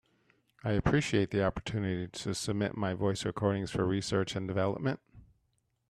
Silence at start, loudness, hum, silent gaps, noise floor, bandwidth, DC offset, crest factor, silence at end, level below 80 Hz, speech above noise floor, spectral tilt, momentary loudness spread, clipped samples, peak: 0.65 s; -32 LUFS; none; none; -77 dBFS; 13 kHz; under 0.1%; 20 dB; 0.65 s; -52 dBFS; 46 dB; -6 dB/octave; 7 LU; under 0.1%; -14 dBFS